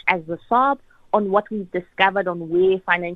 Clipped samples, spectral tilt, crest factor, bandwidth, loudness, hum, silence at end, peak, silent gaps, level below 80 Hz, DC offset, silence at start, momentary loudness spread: under 0.1%; -7.5 dB/octave; 18 dB; 5 kHz; -21 LUFS; none; 0 s; -2 dBFS; none; -58 dBFS; under 0.1%; 0.05 s; 9 LU